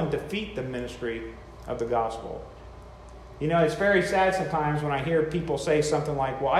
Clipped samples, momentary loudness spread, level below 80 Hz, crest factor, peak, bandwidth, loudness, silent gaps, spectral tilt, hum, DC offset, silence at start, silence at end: under 0.1%; 22 LU; -48 dBFS; 16 dB; -10 dBFS; 14 kHz; -27 LUFS; none; -5.5 dB/octave; none; under 0.1%; 0 s; 0 s